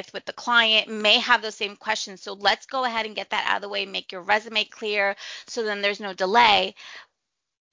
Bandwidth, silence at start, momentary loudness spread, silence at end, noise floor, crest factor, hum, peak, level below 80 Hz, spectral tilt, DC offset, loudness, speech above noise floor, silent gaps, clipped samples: 7.6 kHz; 0 s; 14 LU; 0.7 s; -81 dBFS; 24 dB; none; -2 dBFS; -66 dBFS; -1.5 dB/octave; under 0.1%; -22 LUFS; 57 dB; none; under 0.1%